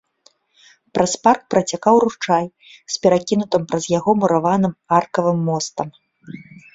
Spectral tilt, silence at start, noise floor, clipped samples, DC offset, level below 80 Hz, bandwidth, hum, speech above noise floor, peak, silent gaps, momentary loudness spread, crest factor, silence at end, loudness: -5 dB/octave; 0.95 s; -58 dBFS; under 0.1%; under 0.1%; -58 dBFS; 8 kHz; none; 39 dB; -2 dBFS; none; 14 LU; 18 dB; 0.3 s; -18 LUFS